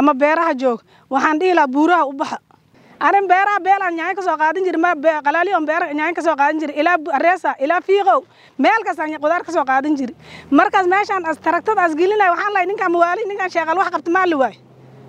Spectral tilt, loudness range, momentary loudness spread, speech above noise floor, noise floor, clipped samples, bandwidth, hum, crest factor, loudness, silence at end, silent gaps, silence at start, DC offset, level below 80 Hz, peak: -4 dB/octave; 1 LU; 6 LU; 32 dB; -49 dBFS; under 0.1%; 10 kHz; none; 16 dB; -17 LUFS; 0.55 s; none; 0 s; under 0.1%; -70 dBFS; 0 dBFS